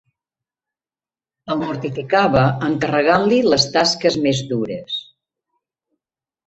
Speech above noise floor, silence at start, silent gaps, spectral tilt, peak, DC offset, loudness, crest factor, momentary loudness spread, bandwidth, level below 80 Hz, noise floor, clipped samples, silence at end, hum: over 73 dB; 1.45 s; none; -5 dB/octave; -2 dBFS; under 0.1%; -18 LUFS; 18 dB; 11 LU; 8.2 kHz; -50 dBFS; under -90 dBFS; under 0.1%; 1.45 s; none